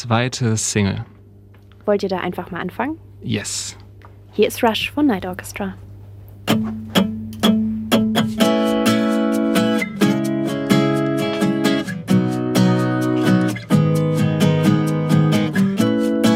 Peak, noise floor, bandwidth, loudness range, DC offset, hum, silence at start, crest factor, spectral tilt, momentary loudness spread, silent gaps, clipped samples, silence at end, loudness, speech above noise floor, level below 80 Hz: -2 dBFS; -44 dBFS; 16.5 kHz; 6 LU; under 0.1%; none; 0 s; 16 dB; -5.5 dB/octave; 10 LU; none; under 0.1%; 0 s; -19 LUFS; 24 dB; -50 dBFS